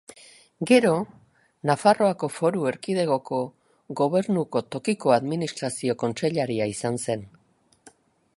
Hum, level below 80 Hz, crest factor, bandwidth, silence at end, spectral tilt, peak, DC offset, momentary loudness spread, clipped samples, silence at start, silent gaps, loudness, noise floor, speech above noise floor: none; -66 dBFS; 22 dB; 11.5 kHz; 1.1 s; -5.5 dB/octave; -4 dBFS; under 0.1%; 11 LU; under 0.1%; 0.1 s; none; -24 LUFS; -56 dBFS; 32 dB